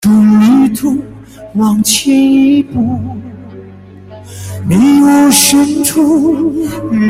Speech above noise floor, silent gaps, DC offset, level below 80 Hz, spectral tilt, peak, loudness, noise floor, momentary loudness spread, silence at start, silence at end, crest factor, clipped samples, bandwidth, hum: 24 dB; none; under 0.1%; -44 dBFS; -4 dB/octave; 0 dBFS; -9 LUFS; -33 dBFS; 19 LU; 0 s; 0 s; 10 dB; under 0.1%; 16.5 kHz; none